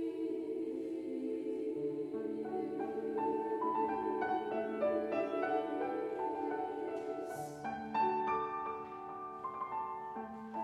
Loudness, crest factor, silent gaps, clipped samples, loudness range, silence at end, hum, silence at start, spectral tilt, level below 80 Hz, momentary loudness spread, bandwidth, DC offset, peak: -38 LUFS; 14 dB; none; under 0.1%; 3 LU; 0 s; none; 0 s; -6.5 dB/octave; -74 dBFS; 8 LU; 13 kHz; under 0.1%; -24 dBFS